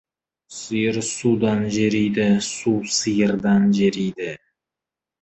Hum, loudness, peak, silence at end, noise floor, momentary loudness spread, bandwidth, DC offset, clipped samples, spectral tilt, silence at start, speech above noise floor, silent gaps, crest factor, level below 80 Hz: none; -20 LUFS; -6 dBFS; 0.85 s; -88 dBFS; 13 LU; 8.6 kHz; under 0.1%; under 0.1%; -5 dB/octave; 0.5 s; 68 dB; none; 14 dB; -56 dBFS